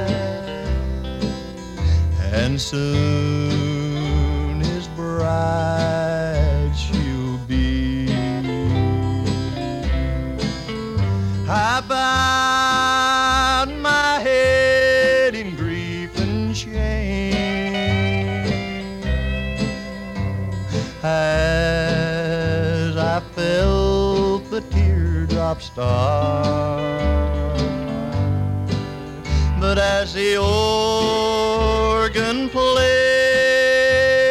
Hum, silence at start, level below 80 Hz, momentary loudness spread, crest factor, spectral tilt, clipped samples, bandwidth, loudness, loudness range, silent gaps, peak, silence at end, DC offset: none; 0 s; -28 dBFS; 10 LU; 14 dB; -5.5 dB/octave; under 0.1%; 13.5 kHz; -20 LUFS; 6 LU; none; -6 dBFS; 0 s; 0.1%